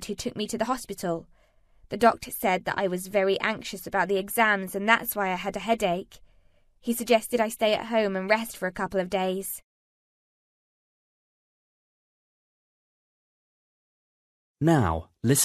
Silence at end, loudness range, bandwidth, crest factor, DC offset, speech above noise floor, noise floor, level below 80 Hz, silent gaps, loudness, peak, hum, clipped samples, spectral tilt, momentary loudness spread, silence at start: 0 s; 8 LU; 14 kHz; 24 dB; under 0.1%; 34 dB; -60 dBFS; -54 dBFS; 9.64-14.55 s; -26 LUFS; -4 dBFS; none; under 0.1%; -4 dB/octave; 9 LU; 0 s